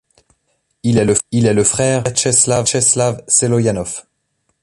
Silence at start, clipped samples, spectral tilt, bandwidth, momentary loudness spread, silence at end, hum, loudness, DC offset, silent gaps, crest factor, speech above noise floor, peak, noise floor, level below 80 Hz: 0.85 s; under 0.1%; -4 dB/octave; 11.5 kHz; 9 LU; 0.65 s; none; -14 LUFS; under 0.1%; none; 16 dB; 53 dB; 0 dBFS; -67 dBFS; -44 dBFS